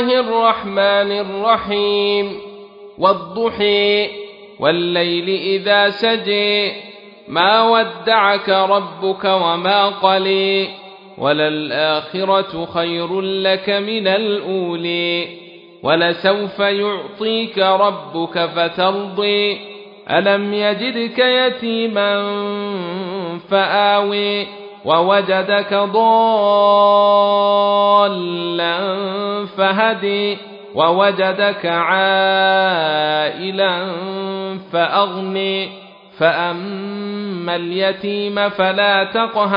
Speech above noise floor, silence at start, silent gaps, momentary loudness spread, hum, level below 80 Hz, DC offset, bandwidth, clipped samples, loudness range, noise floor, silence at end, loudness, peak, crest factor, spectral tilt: 21 dB; 0 s; none; 10 LU; none; -62 dBFS; under 0.1%; 5.4 kHz; under 0.1%; 5 LU; -37 dBFS; 0 s; -16 LUFS; 0 dBFS; 16 dB; -7.5 dB/octave